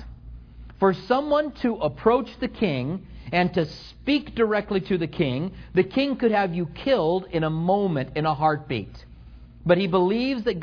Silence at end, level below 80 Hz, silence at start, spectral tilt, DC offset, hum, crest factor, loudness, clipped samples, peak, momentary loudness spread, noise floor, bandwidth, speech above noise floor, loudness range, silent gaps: 0 s; -46 dBFS; 0 s; -8 dB/octave; under 0.1%; none; 18 dB; -24 LUFS; under 0.1%; -6 dBFS; 9 LU; -45 dBFS; 5.4 kHz; 22 dB; 2 LU; none